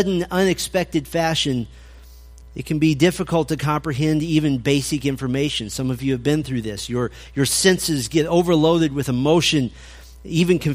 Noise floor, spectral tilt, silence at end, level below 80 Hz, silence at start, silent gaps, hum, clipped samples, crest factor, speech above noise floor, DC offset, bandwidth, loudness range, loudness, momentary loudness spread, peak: -42 dBFS; -5 dB/octave; 0 s; -42 dBFS; 0 s; none; none; under 0.1%; 18 dB; 22 dB; under 0.1%; 15.5 kHz; 3 LU; -20 LUFS; 9 LU; -2 dBFS